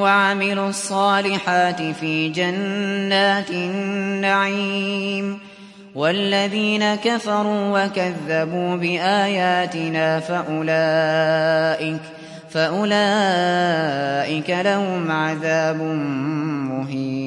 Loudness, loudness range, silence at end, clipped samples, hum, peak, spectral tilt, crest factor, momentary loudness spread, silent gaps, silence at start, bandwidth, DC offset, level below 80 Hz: -20 LUFS; 2 LU; 0 s; under 0.1%; none; -4 dBFS; -5 dB/octave; 16 dB; 6 LU; none; 0 s; 11.5 kHz; under 0.1%; -68 dBFS